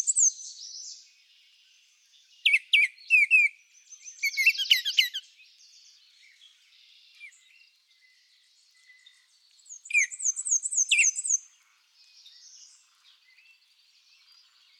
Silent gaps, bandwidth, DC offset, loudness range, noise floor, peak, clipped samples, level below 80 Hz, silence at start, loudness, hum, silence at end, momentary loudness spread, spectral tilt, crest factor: none; 17 kHz; under 0.1%; 10 LU; -64 dBFS; -8 dBFS; under 0.1%; under -90 dBFS; 0 s; -22 LUFS; none; 3.4 s; 21 LU; 13.5 dB/octave; 22 dB